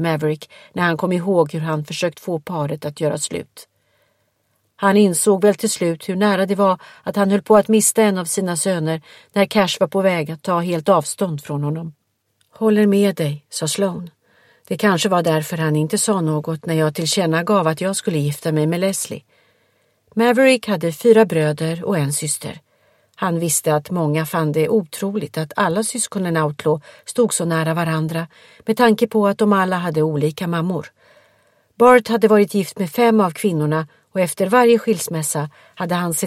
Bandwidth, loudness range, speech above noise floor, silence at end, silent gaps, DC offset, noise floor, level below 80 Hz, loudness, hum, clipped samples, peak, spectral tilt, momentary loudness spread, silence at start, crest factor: 16 kHz; 4 LU; 49 dB; 0 s; none; under 0.1%; -67 dBFS; -62 dBFS; -18 LUFS; none; under 0.1%; 0 dBFS; -5 dB/octave; 10 LU; 0 s; 18 dB